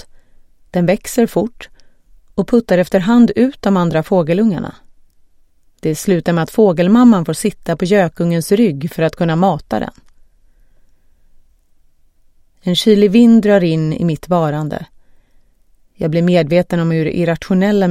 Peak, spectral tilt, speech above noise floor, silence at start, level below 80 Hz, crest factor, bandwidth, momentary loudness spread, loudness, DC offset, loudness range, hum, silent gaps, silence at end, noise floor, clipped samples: 0 dBFS; -6.5 dB/octave; 37 dB; 0.75 s; -44 dBFS; 14 dB; 15 kHz; 12 LU; -14 LUFS; under 0.1%; 6 LU; none; none; 0 s; -50 dBFS; under 0.1%